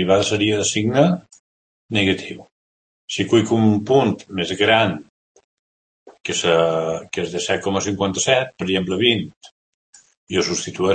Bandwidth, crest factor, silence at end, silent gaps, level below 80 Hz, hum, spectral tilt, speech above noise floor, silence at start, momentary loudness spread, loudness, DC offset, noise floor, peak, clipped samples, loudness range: 8.8 kHz; 20 dB; 0 s; 1.39-1.89 s, 2.52-3.08 s, 5.09-5.35 s, 5.44-6.06 s, 9.37-9.41 s, 9.51-9.93 s, 10.17-10.27 s; -56 dBFS; none; -4 dB/octave; over 71 dB; 0 s; 9 LU; -19 LUFS; under 0.1%; under -90 dBFS; 0 dBFS; under 0.1%; 2 LU